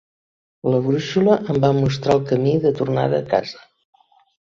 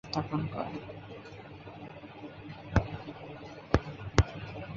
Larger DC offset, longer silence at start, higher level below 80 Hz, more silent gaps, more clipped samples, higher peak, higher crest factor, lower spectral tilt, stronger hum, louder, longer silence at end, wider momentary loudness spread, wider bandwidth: neither; first, 0.65 s vs 0.05 s; second, -52 dBFS vs -42 dBFS; neither; neither; about the same, -2 dBFS vs -2 dBFS; second, 18 dB vs 32 dB; first, -7.5 dB/octave vs -6 dB/octave; neither; first, -19 LUFS vs -34 LUFS; first, 1 s vs 0 s; second, 5 LU vs 17 LU; about the same, 7.4 kHz vs 7.4 kHz